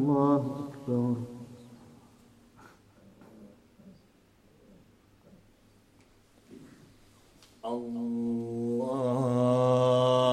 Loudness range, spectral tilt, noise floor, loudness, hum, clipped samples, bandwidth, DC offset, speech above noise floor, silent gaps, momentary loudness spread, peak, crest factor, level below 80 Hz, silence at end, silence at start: 25 LU; -7.5 dB/octave; -62 dBFS; -28 LUFS; none; under 0.1%; 13 kHz; under 0.1%; 33 dB; none; 21 LU; -12 dBFS; 18 dB; -68 dBFS; 0 s; 0 s